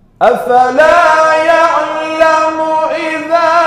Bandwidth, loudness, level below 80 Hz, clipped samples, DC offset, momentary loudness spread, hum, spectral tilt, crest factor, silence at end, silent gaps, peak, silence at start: 14.5 kHz; -10 LUFS; -46 dBFS; 0.2%; under 0.1%; 7 LU; none; -3.5 dB/octave; 10 dB; 0 s; none; 0 dBFS; 0.2 s